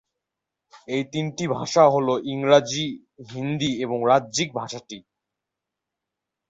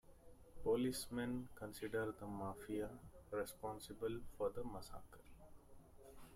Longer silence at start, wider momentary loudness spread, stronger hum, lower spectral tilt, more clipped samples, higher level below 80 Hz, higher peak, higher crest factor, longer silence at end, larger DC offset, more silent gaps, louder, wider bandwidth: first, 0.75 s vs 0.05 s; second, 18 LU vs 23 LU; neither; about the same, -4.5 dB/octave vs -5.5 dB/octave; neither; about the same, -64 dBFS vs -64 dBFS; first, -4 dBFS vs -28 dBFS; about the same, 22 dB vs 18 dB; first, 1.5 s vs 0 s; neither; neither; first, -22 LUFS vs -46 LUFS; second, 8 kHz vs 16 kHz